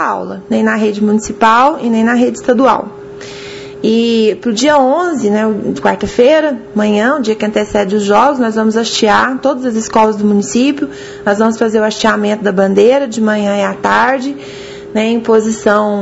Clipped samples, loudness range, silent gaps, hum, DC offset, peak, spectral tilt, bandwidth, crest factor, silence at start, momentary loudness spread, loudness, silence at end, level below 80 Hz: 0.2%; 1 LU; none; none; under 0.1%; 0 dBFS; -5 dB/octave; 8 kHz; 12 dB; 0 s; 9 LU; -12 LUFS; 0 s; -46 dBFS